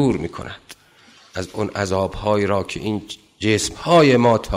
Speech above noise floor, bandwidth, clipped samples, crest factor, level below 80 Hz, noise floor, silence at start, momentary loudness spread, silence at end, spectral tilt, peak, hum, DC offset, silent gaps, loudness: 32 dB; 16 kHz; under 0.1%; 16 dB; -40 dBFS; -50 dBFS; 0 s; 20 LU; 0 s; -5.5 dB/octave; -4 dBFS; none; under 0.1%; none; -19 LUFS